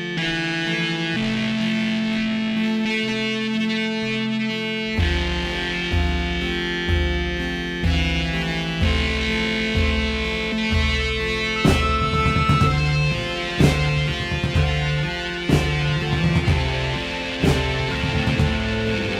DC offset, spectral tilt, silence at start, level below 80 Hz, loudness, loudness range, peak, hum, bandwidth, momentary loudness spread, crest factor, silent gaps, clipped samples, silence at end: under 0.1%; -5.5 dB/octave; 0 s; -28 dBFS; -21 LUFS; 3 LU; -4 dBFS; none; 14 kHz; 5 LU; 18 dB; none; under 0.1%; 0 s